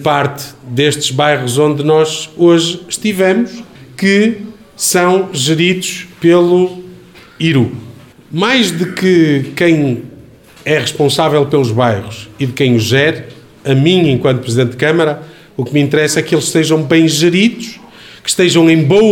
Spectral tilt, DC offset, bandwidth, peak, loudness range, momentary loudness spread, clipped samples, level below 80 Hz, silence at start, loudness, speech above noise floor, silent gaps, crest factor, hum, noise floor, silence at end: -5 dB/octave; under 0.1%; 17.5 kHz; 0 dBFS; 2 LU; 13 LU; under 0.1%; -50 dBFS; 0 s; -12 LUFS; 27 dB; none; 12 dB; none; -38 dBFS; 0 s